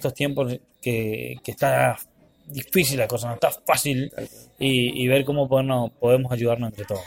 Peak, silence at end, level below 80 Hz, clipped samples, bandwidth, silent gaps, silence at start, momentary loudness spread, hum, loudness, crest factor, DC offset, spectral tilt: -4 dBFS; 0 s; -54 dBFS; under 0.1%; 17 kHz; none; 0 s; 13 LU; none; -23 LUFS; 18 dB; under 0.1%; -5 dB/octave